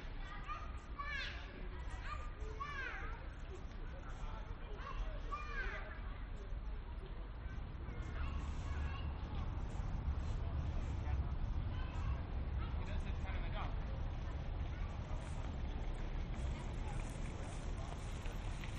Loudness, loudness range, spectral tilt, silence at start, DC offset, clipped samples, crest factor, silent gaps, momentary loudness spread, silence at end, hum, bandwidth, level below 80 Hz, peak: -46 LUFS; 5 LU; -6 dB/octave; 0 s; under 0.1%; under 0.1%; 14 dB; none; 7 LU; 0 s; none; 9.6 kHz; -44 dBFS; -28 dBFS